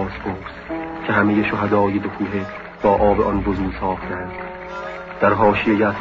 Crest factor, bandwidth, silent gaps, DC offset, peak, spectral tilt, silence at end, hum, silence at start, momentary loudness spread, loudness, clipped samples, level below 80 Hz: 18 dB; 7.2 kHz; none; under 0.1%; -2 dBFS; -8.5 dB/octave; 0 s; none; 0 s; 14 LU; -20 LUFS; under 0.1%; -38 dBFS